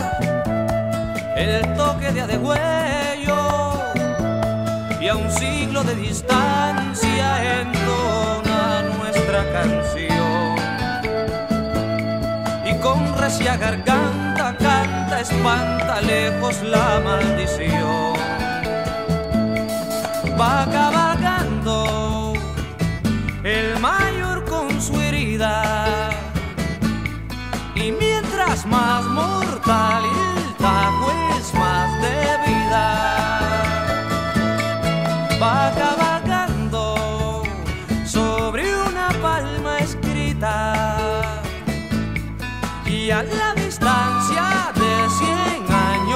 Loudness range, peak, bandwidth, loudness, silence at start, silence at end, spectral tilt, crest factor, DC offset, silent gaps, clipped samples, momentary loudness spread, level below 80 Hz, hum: 3 LU; 0 dBFS; 16 kHz; -20 LUFS; 0 s; 0 s; -5 dB/octave; 20 dB; 0.4%; none; under 0.1%; 6 LU; -34 dBFS; none